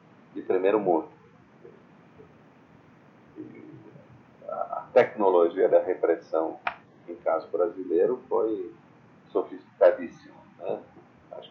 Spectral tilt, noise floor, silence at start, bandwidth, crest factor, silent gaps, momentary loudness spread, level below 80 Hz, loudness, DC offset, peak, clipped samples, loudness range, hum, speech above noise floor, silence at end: -7.5 dB/octave; -55 dBFS; 0.35 s; 6.4 kHz; 22 dB; none; 23 LU; -76 dBFS; -26 LUFS; under 0.1%; -6 dBFS; under 0.1%; 7 LU; none; 30 dB; 0.05 s